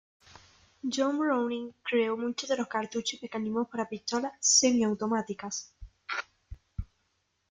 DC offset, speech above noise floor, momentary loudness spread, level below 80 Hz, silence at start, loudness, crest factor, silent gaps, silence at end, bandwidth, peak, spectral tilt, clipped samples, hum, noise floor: under 0.1%; 46 dB; 21 LU; -54 dBFS; 0.85 s; -29 LUFS; 22 dB; none; 0.65 s; 10 kHz; -10 dBFS; -2.5 dB/octave; under 0.1%; none; -76 dBFS